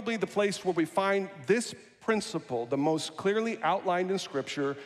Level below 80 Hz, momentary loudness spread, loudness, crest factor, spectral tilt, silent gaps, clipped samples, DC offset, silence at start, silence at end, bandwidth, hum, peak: -74 dBFS; 5 LU; -30 LUFS; 16 dB; -4.5 dB/octave; none; under 0.1%; under 0.1%; 0 s; 0 s; 13.5 kHz; none; -14 dBFS